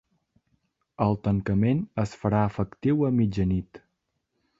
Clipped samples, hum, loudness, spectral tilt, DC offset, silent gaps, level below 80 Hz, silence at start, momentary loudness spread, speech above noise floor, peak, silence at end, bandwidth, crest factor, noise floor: under 0.1%; none; -26 LUFS; -9 dB/octave; under 0.1%; none; -46 dBFS; 1 s; 5 LU; 53 dB; -8 dBFS; 0.8 s; 7.8 kHz; 18 dB; -78 dBFS